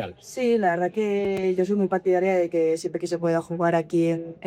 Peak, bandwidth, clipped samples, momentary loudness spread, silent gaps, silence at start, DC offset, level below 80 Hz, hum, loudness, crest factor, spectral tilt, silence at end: -10 dBFS; 14 kHz; under 0.1%; 5 LU; none; 0 s; under 0.1%; -64 dBFS; none; -24 LUFS; 14 dB; -6.5 dB/octave; 0 s